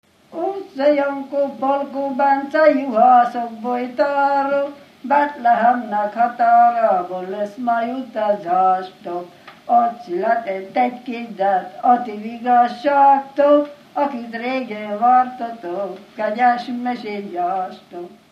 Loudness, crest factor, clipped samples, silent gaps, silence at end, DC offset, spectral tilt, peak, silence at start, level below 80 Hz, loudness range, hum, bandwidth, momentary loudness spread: -18 LUFS; 16 dB; under 0.1%; none; 0.25 s; under 0.1%; -6.5 dB/octave; -2 dBFS; 0.3 s; -74 dBFS; 4 LU; none; 6.6 kHz; 13 LU